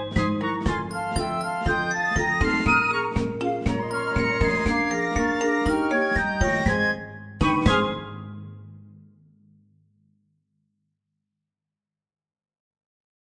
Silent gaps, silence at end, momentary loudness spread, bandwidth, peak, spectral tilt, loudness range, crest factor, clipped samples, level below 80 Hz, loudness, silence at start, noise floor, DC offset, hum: none; 4.3 s; 10 LU; 10 kHz; -4 dBFS; -5.5 dB/octave; 5 LU; 20 dB; under 0.1%; -36 dBFS; -23 LUFS; 0 s; -89 dBFS; under 0.1%; none